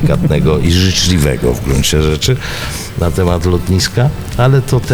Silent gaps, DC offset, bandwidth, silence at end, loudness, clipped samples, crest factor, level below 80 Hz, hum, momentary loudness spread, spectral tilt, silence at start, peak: none; under 0.1%; over 20 kHz; 0 s; -13 LUFS; under 0.1%; 12 dB; -22 dBFS; none; 6 LU; -5 dB/octave; 0 s; 0 dBFS